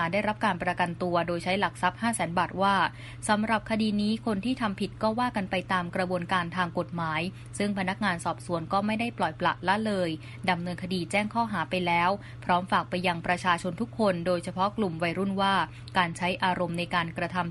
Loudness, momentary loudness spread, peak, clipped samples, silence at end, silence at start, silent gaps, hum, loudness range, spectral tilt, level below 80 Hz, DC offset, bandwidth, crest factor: -28 LUFS; 5 LU; -8 dBFS; under 0.1%; 0 s; 0 s; none; none; 2 LU; -5 dB/octave; -56 dBFS; under 0.1%; 11.5 kHz; 20 dB